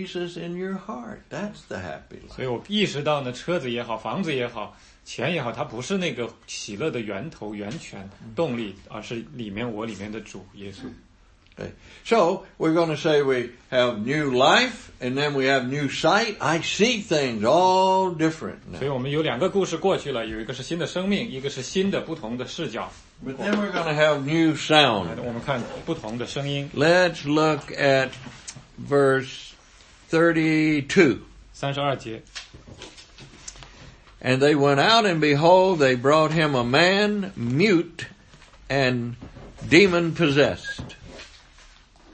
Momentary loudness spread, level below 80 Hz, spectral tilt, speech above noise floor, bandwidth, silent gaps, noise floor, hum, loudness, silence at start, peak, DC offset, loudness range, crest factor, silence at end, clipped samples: 21 LU; -54 dBFS; -5 dB/octave; 32 dB; 8.8 kHz; none; -55 dBFS; none; -22 LUFS; 0 s; 0 dBFS; under 0.1%; 10 LU; 22 dB; 0.85 s; under 0.1%